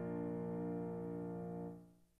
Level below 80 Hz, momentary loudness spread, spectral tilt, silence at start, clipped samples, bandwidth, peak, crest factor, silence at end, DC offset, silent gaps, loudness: -72 dBFS; 7 LU; -11 dB/octave; 0 s; under 0.1%; 3.2 kHz; -34 dBFS; 12 dB; 0.25 s; under 0.1%; none; -45 LUFS